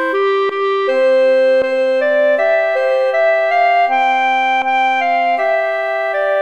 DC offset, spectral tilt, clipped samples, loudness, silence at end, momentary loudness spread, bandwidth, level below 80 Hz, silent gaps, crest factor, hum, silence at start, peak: 0.4%; -2.5 dB/octave; under 0.1%; -14 LUFS; 0 s; 4 LU; 8.4 kHz; -64 dBFS; none; 10 dB; none; 0 s; -2 dBFS